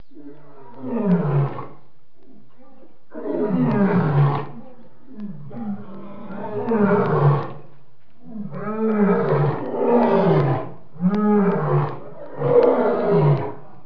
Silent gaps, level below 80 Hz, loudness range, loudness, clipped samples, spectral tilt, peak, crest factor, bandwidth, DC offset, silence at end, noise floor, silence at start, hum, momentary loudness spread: none; -58 dBFS; 5 LU; -20 LUFS; under 0.1%; -11.5 dB/octave; -4 dBFS; 16 dB; 5.4 kHz; 2%; 0.25 s; -56 dBFS; 0.15 s; none; 19 LU